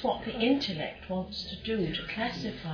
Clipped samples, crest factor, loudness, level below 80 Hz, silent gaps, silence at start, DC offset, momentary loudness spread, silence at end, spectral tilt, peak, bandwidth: under 0.1%; 18 dB; -32 LUFS; -52 dBFS; none; 0 s; under 0.1%; 9 LU; 0 s; -6 dB/octave; -14 dBFS; 5.4 kHz